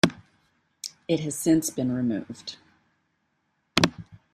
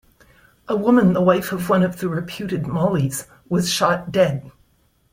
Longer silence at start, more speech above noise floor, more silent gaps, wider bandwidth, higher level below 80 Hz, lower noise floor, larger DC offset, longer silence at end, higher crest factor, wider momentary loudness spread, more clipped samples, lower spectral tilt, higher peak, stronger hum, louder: second, 0.05 s vs 0.7 s; first, 48 dB vs 42 dB; neither; about the same, 15 kHz vs 16.5 kHz; second, -60 dBFS vs -52 dBFS; first, -74 dBFS vs -61 dBFS; neither; second, 0.2 s vs 0.65 s; first, 26 dB vs 18 dB; first, 16 LU vs 10 LU; neither; about the same, -4.5 dB/octave vs -5.5 dB/octave; about the same, -2 dBFS vs -2 dBFS; neither; second, -26 LUFS vs -20 LUFS